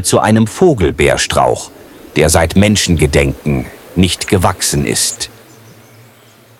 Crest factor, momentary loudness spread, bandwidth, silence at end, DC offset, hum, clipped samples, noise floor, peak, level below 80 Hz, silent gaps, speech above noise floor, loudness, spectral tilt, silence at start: 14 dB; 10 LU; 17 kHz; 1.3 s; under 0.1%; none; under 0.1%; -43 dBFS; 0 dBFS; -28 dBFS; none; 32 dB; -12 LUFS; -4.5 dB/octave; 0 s